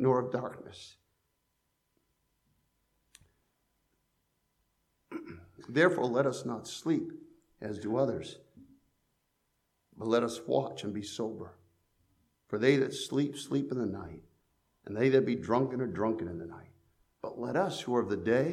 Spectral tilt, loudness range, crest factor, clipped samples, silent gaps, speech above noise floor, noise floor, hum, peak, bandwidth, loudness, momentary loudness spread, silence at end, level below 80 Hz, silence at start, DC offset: -6 dB/octave; 5 LU; 22 dB; under 0.1%; none; 48 dB; -79 dBFS; none; -12 dBFS; 14 kHz; -32 LUFS; 21 LU; 0 s; -70 dBFS; 0 s; under 0.1%